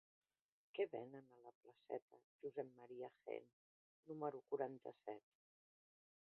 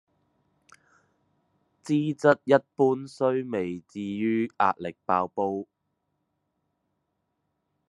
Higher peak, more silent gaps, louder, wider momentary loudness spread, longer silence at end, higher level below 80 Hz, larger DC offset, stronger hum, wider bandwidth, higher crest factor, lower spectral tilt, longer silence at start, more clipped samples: second, -30 dBFS vs -4 dBFS; first, 1.55-1.61 s, 2.02-2.08 s, 2.24-2.39 s, 3.53-4.03 s vs none; second, -51 LUFS vs -26 LUFS; about the same, 12 LU vs 12 LU; second, 1.2 s vs 2.25 s; second, under -90 dBFS vs -78 dBFS; neither; neither; second, 4.3 kHz vs 11 kHz; about the same, 22 dB vs 24 dB; second, -5 dB/octave vs -7 dB/octave; second, 0.75 s vs 1.85 s; neither